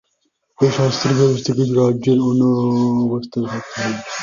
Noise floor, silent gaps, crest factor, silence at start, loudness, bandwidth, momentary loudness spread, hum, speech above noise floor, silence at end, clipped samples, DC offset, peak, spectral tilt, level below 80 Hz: -68 dBFS; none; 14 dB; 0.6 s; -17 LUFS; 7.4 kHz; 8 LU; none; 51 dB; 0 s; under 0.1%; under 0.1%; -2 dBFS; -6.5 dB/octave; -54 dBFS